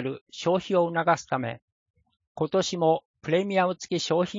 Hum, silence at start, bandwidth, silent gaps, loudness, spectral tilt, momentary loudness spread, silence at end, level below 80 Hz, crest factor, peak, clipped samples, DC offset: none; 0 s; 7.6 kHz; 0.21-0.26 s, 1.62-1.94 s, 2.27-2.35 s, 3.05-3.14 s; -26 LUFS; -5 dB/octave; 8 LU; 0 s; -68 dBFS; 18 dB; -8 dBFS; under 0.1%; under 0.1%